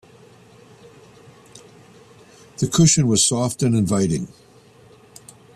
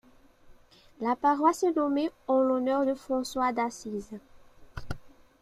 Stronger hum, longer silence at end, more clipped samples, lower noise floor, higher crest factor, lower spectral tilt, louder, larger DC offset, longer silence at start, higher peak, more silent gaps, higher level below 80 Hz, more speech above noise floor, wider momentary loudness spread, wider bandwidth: neither; first, 1.3 s vs 0.35 s; neither; second, -49 dBFS vs -55 dBFS; about the same, 20 dB vs 20 dB; about the same, -4.5 dB/octave vs -5 dB/octave; first, -18 LUFS vs -28 LUFS; neither; first, 1.55 s vs 0.5 s; first, -4 dBFS vs -10 dBFS; neither; about the same, -52 dBFS vs -54 dBFS; about the same, 31 dB vs 28 dB; second, 12 LU vs 19 LU; about the same, 13.5 kHz vs 14.5 kHz